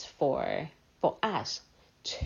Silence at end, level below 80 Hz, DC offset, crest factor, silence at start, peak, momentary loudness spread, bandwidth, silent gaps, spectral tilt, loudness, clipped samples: 0 s; -64 dBFS; under 0.1%; 20 dB; 0 s; -14 dBFS; 11 LU; 7.4 kHz; none; -4.5 dB/octave; -33 LUFS; under 0.1%